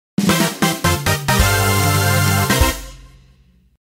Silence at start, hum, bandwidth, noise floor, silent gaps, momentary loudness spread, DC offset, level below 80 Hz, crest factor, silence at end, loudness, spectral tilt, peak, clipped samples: 0.2 s; none; 16.5 kHz; -52 dBFS; none; 3 LU; under 0.1%; -28 dBFS; 16 dB; 0.75 s; -16 LUFS; -4 dB/octave; -2 dBFS; under 0.1%